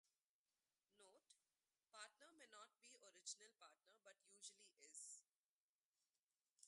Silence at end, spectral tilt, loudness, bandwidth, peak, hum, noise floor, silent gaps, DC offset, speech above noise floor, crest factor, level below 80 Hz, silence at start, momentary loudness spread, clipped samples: 0 s; 2 dB/octave; -62 LUFS; 11.5 kHz; -40 dBFS; none; under -90 dBFS; 0.21-0.45 s, 5.28-5.93 s, 6.19-6.30 s, 6.41-6.45 s, 6.51-6.57 s; under 0.1%; over 25 dB; 28 dB; under -90 dBFS; 0.05 s; 12 LU; under 0.1%